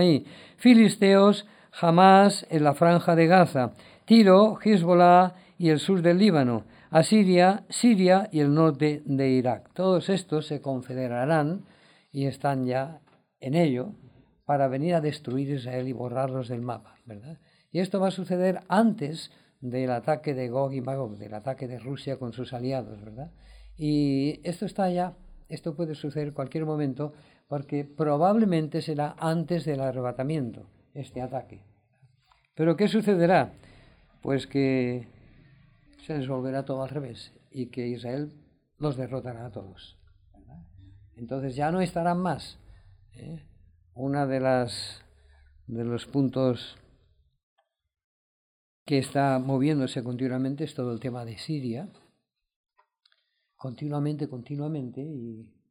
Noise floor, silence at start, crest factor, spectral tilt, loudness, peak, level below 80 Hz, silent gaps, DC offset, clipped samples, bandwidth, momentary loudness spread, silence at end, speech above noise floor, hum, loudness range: -74 dBFS; 0 s; 20 dB; -7 dB/octave; -25 LUFS; -4 dBFS; -62 dBFS; 47.43-47.56 s, 48.04-48.86 s, 52.56-52.64 s; under 0.1%; under 0.1%; 15.5 kHz; 19 LU; 0.25 s; 49 dB; none; 14 LU